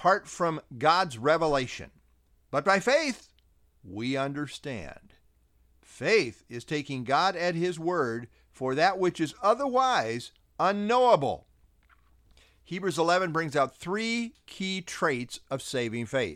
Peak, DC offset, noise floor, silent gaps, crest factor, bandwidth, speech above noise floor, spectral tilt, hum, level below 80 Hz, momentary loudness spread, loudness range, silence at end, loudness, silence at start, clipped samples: -8 dBFS; under 0.1%; -65 dBFS; none; 20 dB; 15 kHz; 37 dB; -4.5 dB/octave; none; -60 dBFS; 13 LU; 5 LU; 0 s; -28 LUFS; 0 s; under 0.1%